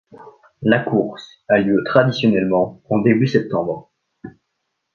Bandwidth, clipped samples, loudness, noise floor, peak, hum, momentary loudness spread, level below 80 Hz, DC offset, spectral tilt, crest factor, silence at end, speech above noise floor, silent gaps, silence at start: 6.8 kHz; under 0.1%; -18 LUFS; -74 dBFS; 0 dBFS; none; 10 LU; -56 dBFS; under 0.1%; -8 dB/octave; 18 dB; 0.65 s; 57 dB; none; 0.15 s